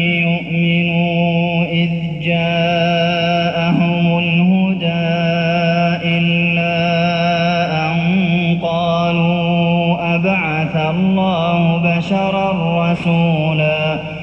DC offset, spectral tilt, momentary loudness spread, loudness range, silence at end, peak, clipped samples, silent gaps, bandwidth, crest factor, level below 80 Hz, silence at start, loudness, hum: under 0.1%; -7.5 dB/octave; 2 LU; 1 LU; 0 s; -4 dBFS; under 0.1%; none; 6.2 kHz; 12 dB; -46 dBFS; 0 s; -15 LUFS; none